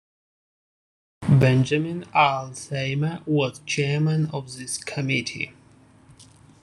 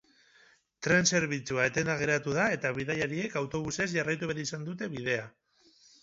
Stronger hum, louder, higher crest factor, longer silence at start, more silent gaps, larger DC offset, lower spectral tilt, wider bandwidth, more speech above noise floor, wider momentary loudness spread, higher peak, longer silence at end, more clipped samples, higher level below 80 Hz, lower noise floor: neither; first, -23 LUFS vs -30 LUFS; about the same, 20 dB vs 20 dB; first, 1.2 s vs 0.8 s; neither; neither; first, -5.5 dB/octave vs -4 dB/octave; first, 12 kHz vs 8 kHz; about the same, 30 dB vs 33 dB; about the same, 12 LU vs 10 LU; first, -4 dBFS vs -10 dBFS; second, 0.4 s vs 0.75 s; neither; first, -56 dBFS vs -62 dBFS; second, -53 dBFS vs -63 dBFS